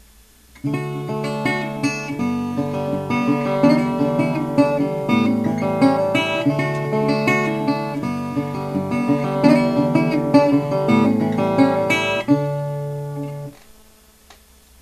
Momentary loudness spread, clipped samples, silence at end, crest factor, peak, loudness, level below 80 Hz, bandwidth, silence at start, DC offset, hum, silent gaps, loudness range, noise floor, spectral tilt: 9 LU; under 0.1%; 1.25 s; 18 dB; 0 dBFS; -19 LUFS; -52 dBFS; 14 kHz; 0.55 s; under 0.1%; none; none; 4 LU; -50 dBFS; -7 dB/octave